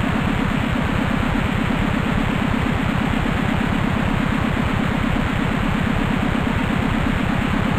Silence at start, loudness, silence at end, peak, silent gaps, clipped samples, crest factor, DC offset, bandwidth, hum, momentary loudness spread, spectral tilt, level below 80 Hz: 0 s; -20 LUFS; 0 s; -8 dBFS; none; under 0.1%; 12 dB; 0.4%; 15 kHz; none; 0 LU; -6.5 dB/octave; -28 dBFS